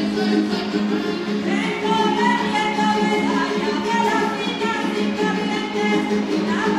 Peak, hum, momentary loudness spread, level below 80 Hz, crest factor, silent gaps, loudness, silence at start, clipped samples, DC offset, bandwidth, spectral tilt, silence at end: -6 dBFS; none; 4 LU; -56 dBFS; 14 dB; none; -20 LUFS; 0 s; under 0.1%; under 0.1%; 12.5 kHz; -5 dB/octave; 0 s